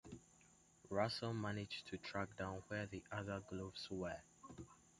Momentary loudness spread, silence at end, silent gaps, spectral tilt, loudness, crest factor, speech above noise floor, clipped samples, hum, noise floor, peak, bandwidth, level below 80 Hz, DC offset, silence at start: 16 LU; 0.15 s; none; -5.5 dB/octave; -46 LUFS; 24 dB; 25 dB; under 0.1%; none; -71 dBFS; -24 dBFS; 11.5 kHz; -68 dBFS; under 0.1%; 0.05 s